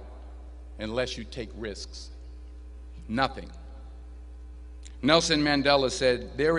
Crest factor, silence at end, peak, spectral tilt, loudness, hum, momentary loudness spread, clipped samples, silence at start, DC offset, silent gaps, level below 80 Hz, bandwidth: 24 dB; 0 s; -6 dBFS; -4 dB/octave; -26 LUFS; none; 24 LU; under 0.1%; 0 s; under 0.1%; none; -42 dBFS; 10.5 kHz